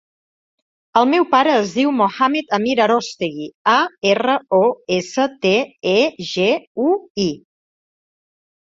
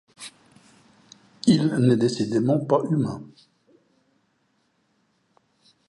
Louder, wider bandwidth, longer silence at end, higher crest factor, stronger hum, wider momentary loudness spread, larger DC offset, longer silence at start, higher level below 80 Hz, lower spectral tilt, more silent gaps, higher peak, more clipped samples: first, -17 LUFS vs -22 LUFS; second, 7.8 kHz vs 11.5 kHz; second, 1.25 s vs 2.6 s; about the same, 16 dB vs 20 dB; neither; second, 7 LU vs 21 LU; neither; first, 0.95 s vs 0.2 s; about the same, -62 dBFS vs -66 dBFS; second, -4.5 dB/octave vs -7 dB/octave; first, 3.54-3.65 s, 6.67-6.75 s, 7.10-7.15 s vs none; first, -2 dBFS vs -6 dBFS; neither